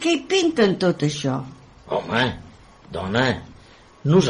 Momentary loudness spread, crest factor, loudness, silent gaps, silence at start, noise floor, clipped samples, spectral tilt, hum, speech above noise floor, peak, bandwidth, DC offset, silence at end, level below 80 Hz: 12 LU; 18 dB; -22 LUFS; none; 0 s; -48 dBFS; under 0.1%; -5.5 dB/octave; none; 28 dB; -4 dBFS; 10.5 kHz; under 0.1%; 0 s; -50 dBFS